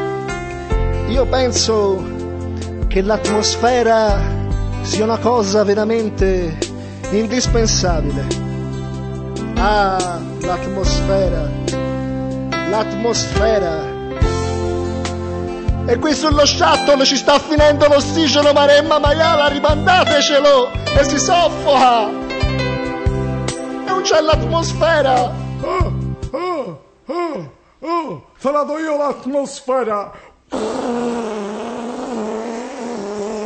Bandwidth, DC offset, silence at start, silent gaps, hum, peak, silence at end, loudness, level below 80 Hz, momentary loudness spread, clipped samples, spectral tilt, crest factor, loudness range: 8.8 kHz; under 0.1%; 0 s; none; none; -2 dBFS; 0 s; -16 LUFS; -28 dBFS; 13 LU; under 0.1%; -4.5 dB/octave; 14 dB; 9 LU